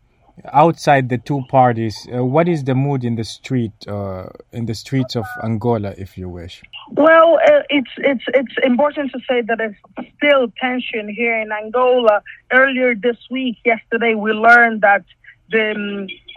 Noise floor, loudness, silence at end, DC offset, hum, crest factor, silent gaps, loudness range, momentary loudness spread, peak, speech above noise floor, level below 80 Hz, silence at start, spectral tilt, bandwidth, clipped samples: -40 dBFS; -16 LUFS; 0.05 s; under 0.1%; none; 16 dB; none; 7 LU; 15 LU; 0 dBFS; 24 dB; -54 dBFS; 0.45 s; -6.5 dB/octave; 15 kHz; under 0.1%